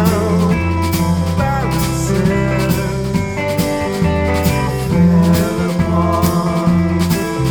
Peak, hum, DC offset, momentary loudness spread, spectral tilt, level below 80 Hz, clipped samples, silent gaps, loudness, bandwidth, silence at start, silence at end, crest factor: 0 dBFS; none; under 0.1%; 4 LU; -6.5 dB/octave; -28 dBFS; under 0.1%; none; -15 LUFS; 20 kHz; 0 s; 0 s; 14 dB